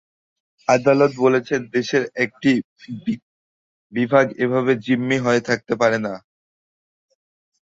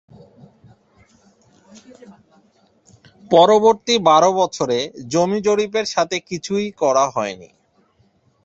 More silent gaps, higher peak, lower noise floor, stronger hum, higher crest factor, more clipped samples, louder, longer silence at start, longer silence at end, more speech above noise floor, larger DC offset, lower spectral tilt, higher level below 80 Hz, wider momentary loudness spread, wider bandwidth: first, 2.64-2.76 s, 3.22-3.90 s vs none; about the same, -2 dBFS vs 0 dBFS; first, under -90 dBFS vs -59 dBFS; neither; about the same, 18 dB vs 20 dB; neither; second, -20 LUFS vs -17 LUFS; second, 0.7 s vs 2.1 s; first, 1.55 s vs 1 s; first, over 71 dB vs 42 dB; neither; first, -6 dB/octave vs -4 dB/octave; about the same, -62 dBFS vs -62 dBFS; about the same, 12 LU vs 11 LU; about the same, 7.8 kHz vs 8 kHz